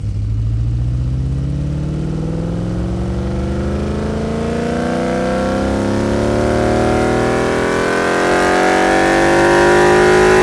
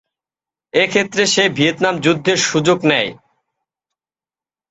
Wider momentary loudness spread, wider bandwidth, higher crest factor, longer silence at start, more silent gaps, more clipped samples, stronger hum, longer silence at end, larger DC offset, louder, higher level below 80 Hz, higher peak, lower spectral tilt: first, 10 LU vs 4 LU; first, 12 kHz vs 8.2 kHz; about the same, 14 dB vs 18 dB; second, 0 s vs 0.75 s; neither; neither; neither; second, 0 s vs 1.55 s; neither; about the same, -15 LUFS vs -15 LUFS; first, -26 dBFS vs -58 dBFS; about the same, 0 dBFS vs 0 dBFS; first, -6 dB/octave vs -3.5 dB/octave